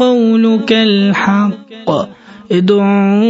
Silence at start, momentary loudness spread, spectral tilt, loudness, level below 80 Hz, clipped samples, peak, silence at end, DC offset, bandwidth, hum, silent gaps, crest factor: 0 s; 8 LU; -7 dB/octave; -12 LUFS; -56 dBFS; under 0.1%; 0 dBFS; 0 s; under 0.1%; 7.6 kHz; none; none; 12 dB